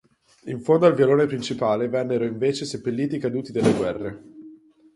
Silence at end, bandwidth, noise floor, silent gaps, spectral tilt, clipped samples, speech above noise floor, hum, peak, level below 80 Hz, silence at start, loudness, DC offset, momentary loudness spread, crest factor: 0.4 s; 11.5 kHz; -48 dBFS; none; -6.5 dB/octave; under 0.1%; 26 dB; none; -4 dBFS; -58 dBFS; 0.45 s; -22 LUFS; under 0.1%; 14 LU; 18 dB